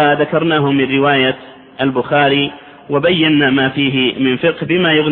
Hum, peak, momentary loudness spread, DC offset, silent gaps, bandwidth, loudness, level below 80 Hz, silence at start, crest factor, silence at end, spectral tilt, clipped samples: none; 0 dBFS; 6 LU; under 0.1%; none; 4.2 kHz; -14 LUFS; -50 dBFS; 0 s; 14 dB; 0 s; -9.5 dB/octave; under 0.1%